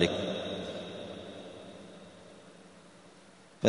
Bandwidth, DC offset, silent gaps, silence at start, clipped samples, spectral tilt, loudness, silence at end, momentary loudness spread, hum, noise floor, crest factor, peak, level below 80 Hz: 10.5 kHz; under 0.1%; none; 0 s; under 0.1%; -5 dB/octave; -39 LUFS; 0 s; 20 LU; none; -57 dBFS; 28 dB; -8 dBFS; -64 dBFS